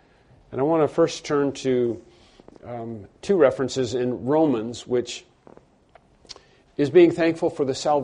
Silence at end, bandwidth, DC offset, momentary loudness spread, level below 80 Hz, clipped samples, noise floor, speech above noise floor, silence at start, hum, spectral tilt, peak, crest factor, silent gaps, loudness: 0 s; 10.5 kHz; under 0.1%; 18 LU; -60 dBFS; under 0.1%; -56 dBFS; 34 dB; 0.5 s; none; -6 dB/octave; -4 dBFS; 20 dB; none; -22 LUFS